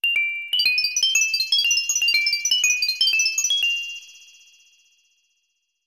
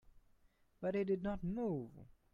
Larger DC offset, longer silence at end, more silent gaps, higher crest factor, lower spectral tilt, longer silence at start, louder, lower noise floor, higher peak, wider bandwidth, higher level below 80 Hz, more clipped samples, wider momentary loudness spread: neither; first, 1.7 s vs 0.3 s; neither; about the same, 16 dB vs 16 dB; second, 5.5 dB/octave vs -9.5 dB/octave; about the same, 0.05 s vs 0.05 s; first, -18 LUFS vs -40 LUFS; about the same, -73 dBFS vs -72 dBFS; first, -6 dBFS vs -26 dBFS; first, 16.5 kHz vs 7 kHz; second, -70 dBFS vs -62 dBFS; neither; second, 4 LU vs 7 LU